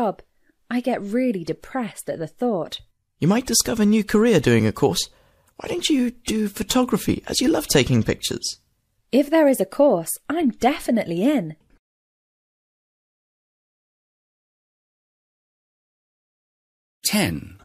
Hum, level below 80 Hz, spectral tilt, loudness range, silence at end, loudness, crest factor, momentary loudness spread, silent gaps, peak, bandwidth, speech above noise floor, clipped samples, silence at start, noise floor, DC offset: none; -48 dBFS; -4.5 dB/octave; 7 LU; 0.1 s; -21 LUFS; 20 dB; 12 LU; 11.79-17.01 s; -2 dBFS; 15.5 kHz; 47 dB; under 0.1%; 0 s; -68 dBFS; under 0.1%